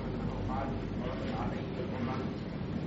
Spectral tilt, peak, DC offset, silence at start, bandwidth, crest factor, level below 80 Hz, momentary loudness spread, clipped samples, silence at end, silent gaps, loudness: -6.5 dB/octave; -24 dBFS; under 0.1%; 0 s; 7.6 kHz; 12 dB; -46 dBFS; 2 LU; under 0.1%; 0 s; none; -36 LUFS